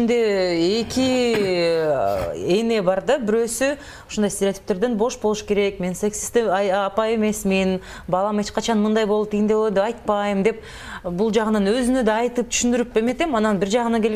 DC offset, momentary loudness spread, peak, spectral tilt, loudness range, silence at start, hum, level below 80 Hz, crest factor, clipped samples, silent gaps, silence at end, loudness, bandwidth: under 0.1%; 5 LU; -6 dBFS; -4.5 dB/octave; 2 LU; 0 s; none; -46 dBFS; 14 dB; under 0.1%; none; 0 s; -21 LUFS; 16 kHz